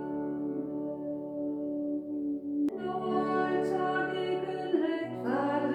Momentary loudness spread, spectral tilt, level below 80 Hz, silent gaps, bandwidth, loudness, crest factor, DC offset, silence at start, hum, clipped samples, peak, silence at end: 6 LU; -7.5 dB/octave; -70 dBFS; none; 8.6 kHz; -32 LUFS; 16 dB; under 0.1%; 0 s; none; under 0.1%; -16 dBFS; 0 s